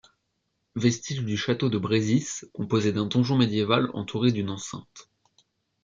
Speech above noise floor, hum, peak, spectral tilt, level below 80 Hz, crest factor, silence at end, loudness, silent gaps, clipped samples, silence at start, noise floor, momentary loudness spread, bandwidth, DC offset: 51 dB; none; -6 dBFS; -5.5 dB/octave; -64 dBFS; 20 dB; 0.8 s; -26 LUFS; none; under 0.1%; 0.75 s; -77 dBFS; 11 LU; 7.6 kHz; under 0.1%